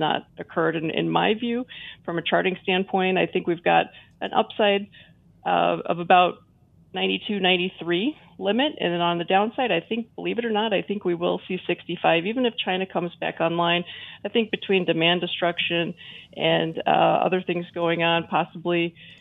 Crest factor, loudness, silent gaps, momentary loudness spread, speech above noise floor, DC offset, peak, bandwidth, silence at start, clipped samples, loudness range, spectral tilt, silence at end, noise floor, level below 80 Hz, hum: 20 dB; -23 LUFS; none; 9 LU; 33 dB; under 0.1%; -2 dBFS; 4.3 kHz; 0 s; under 0.1%; 2 LU; -8 dB/octave; 0.05 s; -56 dBFS; -68 dBFS; none